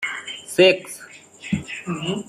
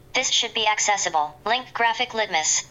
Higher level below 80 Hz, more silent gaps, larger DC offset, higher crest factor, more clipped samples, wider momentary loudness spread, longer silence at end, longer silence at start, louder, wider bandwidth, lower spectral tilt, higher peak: about the same, -58 dBFS vs -60 dBFS; neither; neither; first, 20 dB vs 14 dB; neither; first, 21 LU vs 5 LU; about the same, 0.05 s vs 0.05 s; second, 0 s vs 0.15 s; about the same, -21 LUFS vs -21 LUFS; about the same, 14.5 kHz vs 15.5 kHz; first, -4.5 dB/octave vs 0.5 dB/octave; first, -2 dBFS vs -10 dBFS